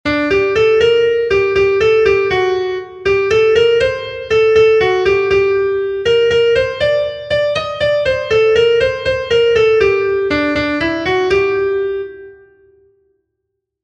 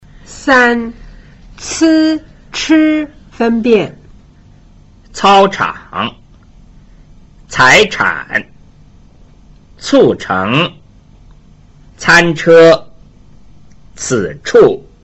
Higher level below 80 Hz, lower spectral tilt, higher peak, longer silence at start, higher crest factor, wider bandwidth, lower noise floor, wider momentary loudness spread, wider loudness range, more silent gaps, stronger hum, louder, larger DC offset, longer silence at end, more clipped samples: about the same, -40 dBFS vs -40 dBFS; about the same, -5 dB/octave vs -4.5 dB/octave; about the same, 0 dBFS vs 0 dBFS; second, 0.05 s vs 0.3 s; about the same, 12 dB vs 14 dB; about the same, 8.4 kHz vs 8.2 kHz; first, -74 dBFS vs -42 dBFS; second, 6 LU vs 15 LU; about the same, 3 LU vs 5 LU; neither; neither; about the same, -13 LUFS vs -11 LUFS; neither; first, 1.5 s vs 0.25 s; neither